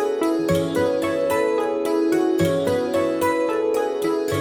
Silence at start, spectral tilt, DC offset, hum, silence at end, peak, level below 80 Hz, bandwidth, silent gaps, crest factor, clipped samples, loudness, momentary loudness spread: 0 s; -6 dB/octave; under 0.1%; none; 0 s; -8 dBFS; -54 dBFS; 17.5 kHz; none; 12 dB; under 0.1%; -21 LUFS; 2 LU